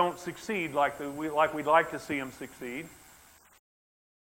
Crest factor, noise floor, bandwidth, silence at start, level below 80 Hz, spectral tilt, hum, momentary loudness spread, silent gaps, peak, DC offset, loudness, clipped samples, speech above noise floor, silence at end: 22 dB; -58 dBFS; 16.5 kHz; 0 s; -66 dBFS; -4.5 dB/octave; none; 16 LU; none; -10 dBFS; under 0.1%; -30 LUFS; under 0.1%; 27 dB; 1.25 s